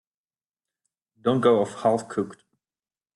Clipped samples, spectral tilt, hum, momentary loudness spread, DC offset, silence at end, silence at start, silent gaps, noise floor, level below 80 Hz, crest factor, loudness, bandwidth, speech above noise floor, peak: under 0.1%; -6.5 dB/octave; none; 11 LU; under 0.1%; 0.8 s; 1.25 s; none; under -90 dBFS; -70 dBFS; 20 dB; -24 LUFS; 11.5 kHz; over 67 dB; -6 dBFS